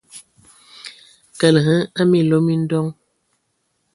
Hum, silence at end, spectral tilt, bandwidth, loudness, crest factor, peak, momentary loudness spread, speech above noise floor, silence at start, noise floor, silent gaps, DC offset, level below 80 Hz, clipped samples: none; 1 s; -6.5 dB/octave; 11.5 kHz; -17 LUFS; 20 dB; 0 dBFS; 22 LU; 54 dB; 0.15 s; -69 dBFS; none; under 0.1%; -60 dBFS; under 0.1%